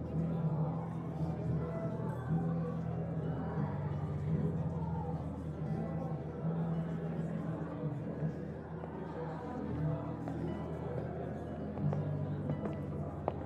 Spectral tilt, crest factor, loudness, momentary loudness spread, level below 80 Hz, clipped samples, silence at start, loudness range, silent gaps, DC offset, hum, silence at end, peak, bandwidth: -10 dB/octave; 22 dB; -38 LUFS; 6 LU; -58 dBFS; under 0.1%; 0 s; 3 LU; none; under 0.1%; none; 0 s; -14 dBFS; 4.7 kHz